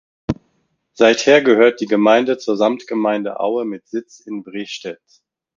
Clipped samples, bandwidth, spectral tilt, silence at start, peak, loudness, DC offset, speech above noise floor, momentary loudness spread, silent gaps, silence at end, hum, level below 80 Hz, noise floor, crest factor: under 0.1%; 7.6 kHz; -4.5 dB/octave; 0.3 s; 0 dBFS; -16 LUFS; under 0.1%; 50 dB; 16 LU; none; 0.65 s; none; -52 dBFS; -66 dBFS; 18 dB